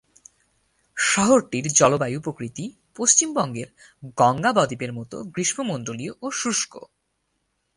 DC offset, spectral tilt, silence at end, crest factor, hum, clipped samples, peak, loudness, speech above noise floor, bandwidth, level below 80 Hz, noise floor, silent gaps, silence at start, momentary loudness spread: under 0.1%; -3 dB/octave; 0.95 s; 22 dB; none; under 0.1%; -2 dBFS; -21 LUFS; 51 dB; 11.5 kHz; -60 dBFS; -74 dBFS; none; 0.95 s; 17 LU